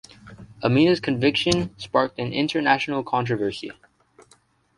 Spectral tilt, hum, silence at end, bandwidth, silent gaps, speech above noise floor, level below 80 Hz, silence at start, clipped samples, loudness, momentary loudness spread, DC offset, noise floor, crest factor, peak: -5.5 dB/octave; none; 1.05 s; 11.5 kHz; none; 38 dB; -54 dBFS; 0.25 s; under 0.1%; -22 LUFS; 8 LU; under 0.1%; -60 dBFS; 22 dB; -2 dBFS